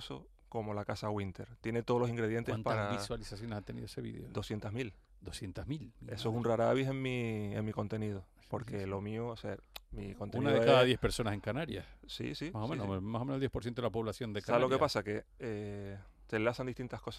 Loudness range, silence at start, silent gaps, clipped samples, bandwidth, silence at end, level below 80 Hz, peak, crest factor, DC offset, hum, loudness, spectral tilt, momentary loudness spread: 7 LU; 0 s; none; under 0.1%; 14 kHz; 0 s; -56 dBFS; -14 dBFS; 22 dB; under 0.1%; none; -36 LUFS; -6 dB/octave; 14 LU